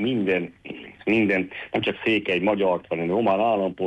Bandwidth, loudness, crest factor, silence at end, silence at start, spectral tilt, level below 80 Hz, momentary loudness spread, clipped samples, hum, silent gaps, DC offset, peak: 8.8 kHz; -23 LUFS; 12 dB; 0 s; 0 s; -7.5 dB/octave; -58 dBFS; 9 LU; under 0.1%; none; none; under 0.1%; -10 dBFS